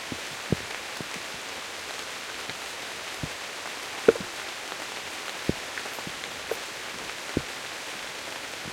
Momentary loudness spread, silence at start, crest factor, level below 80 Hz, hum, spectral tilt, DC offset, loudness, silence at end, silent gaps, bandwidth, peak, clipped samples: 4 LU; 0 s; 28 dB; -56 dBFS; none; -3 dB/octave; under 0.1%; -32 LUFS; 0 s; none; 16.5 kHz; -4 dBFS; under 0.1%